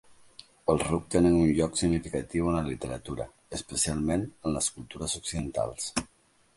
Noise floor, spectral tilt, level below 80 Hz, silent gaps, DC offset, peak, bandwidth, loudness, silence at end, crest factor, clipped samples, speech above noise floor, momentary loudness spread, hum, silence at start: -54 dBFS; -5 dB/octave; -46 dBFS; none; under 0.1%; -8 dBFS; 11.5 kHz; -29 LUFS; 0.5 s; 20 dB; under 0.1%; 26 dB; 12 LU; none; 0.65 s